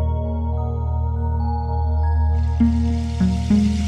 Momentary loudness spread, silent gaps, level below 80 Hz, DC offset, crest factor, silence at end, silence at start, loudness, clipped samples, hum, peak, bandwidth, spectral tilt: 6 LU; none; -22 dBFS; under 0.1%; 12 dB; 0 s; 0 s; -21 LUFS; under 0.1%; none; -6 dBFS; 8.4 kHz; -8.5 dB/octave